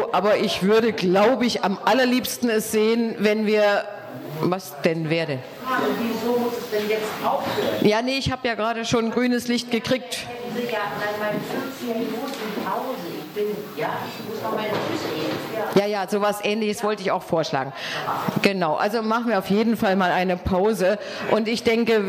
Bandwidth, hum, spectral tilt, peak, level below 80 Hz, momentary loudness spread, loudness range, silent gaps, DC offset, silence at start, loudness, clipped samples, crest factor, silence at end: 19 kHz; none; -5 dB/octave; -6 dBFS; -52 dBFS; 9 LU; 7 LU; none; under 0.1%; 0 s; -23 LUFS; under 0.1%; 18 dB; 0 s